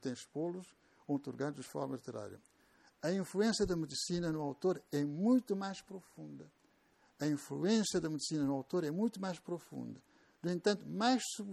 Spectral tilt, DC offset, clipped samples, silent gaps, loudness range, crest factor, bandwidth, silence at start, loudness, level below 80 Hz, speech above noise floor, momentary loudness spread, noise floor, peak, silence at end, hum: -5 dB/octave; under 0.1%; under 0.1%; none; 3 LU; 18 dB; 14.5 kHz; 0.05 s; -37 LUFS; -66 dBFS; 34 dB; 16 LU; -71 dBFS; -20 dBFS; 0 s; none